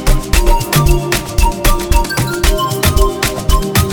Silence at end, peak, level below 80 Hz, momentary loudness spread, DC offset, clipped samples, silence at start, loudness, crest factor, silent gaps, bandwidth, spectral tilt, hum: 0 s; 0 dBFS; -14 dBFS; 4 LU; 0.6%; 0.1%; 0 s; -14 LUFS; 12 dB; none; over 20 kHz; -4.5 dB/octave; none